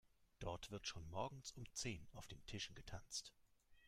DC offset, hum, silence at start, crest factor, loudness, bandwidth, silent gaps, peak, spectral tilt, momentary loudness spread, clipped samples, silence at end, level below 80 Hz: under 0.1%; none; 0.2 s; 20 dB; -51 LUFS; 16 kHz; none; -32 dBFS; -3 dB/octave; 9 LU; under 0.1%; 0 s; -64 dBFS